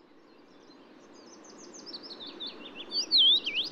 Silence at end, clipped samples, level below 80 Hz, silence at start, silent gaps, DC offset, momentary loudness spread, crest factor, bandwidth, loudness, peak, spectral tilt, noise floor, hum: 0 s; under 0.1%; -78 dBFS; 1.3 s; none; under 0.1%; 24 LU; 16 dB; 13 kHz; -22 LUFS; -16 dBFS; 0 dB/octave; -57 dBFS; none